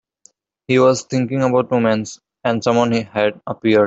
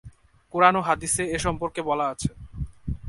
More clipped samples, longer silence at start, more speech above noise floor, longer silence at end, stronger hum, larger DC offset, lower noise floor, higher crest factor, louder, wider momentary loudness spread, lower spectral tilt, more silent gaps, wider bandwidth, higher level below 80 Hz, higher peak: neither; first, 0.7 s vs 0.05 s; first, 38 dB vs 25 dB; about the same, 0 s vs 0 s; neither; neither; first, -55 dBFS vs -49 dBFS; second, 16 dB vs 24 dB; first, -18 LUFS vs -24 LUFS; second, 8 LU vs 15 LU; first, -6 dB/octave vs -4 dB/octave; neither; second, 8 kHz vs 11.5 kHz; second, -58 dBFS vs -42 dBFS; about the same, -2 dBFS vs -2 dBFS